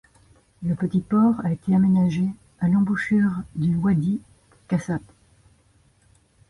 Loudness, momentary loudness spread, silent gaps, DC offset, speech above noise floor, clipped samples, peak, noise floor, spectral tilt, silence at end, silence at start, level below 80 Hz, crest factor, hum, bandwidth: -23 LUFS; 9 LU; none; under 0.1%; 39 dB; under 0.1%; -10 dBFS; -60 dBFS; -8.5 dB/octave; 1.5 s; 0.6 s; -54 dBFS; 12 dB; none; 11 kHz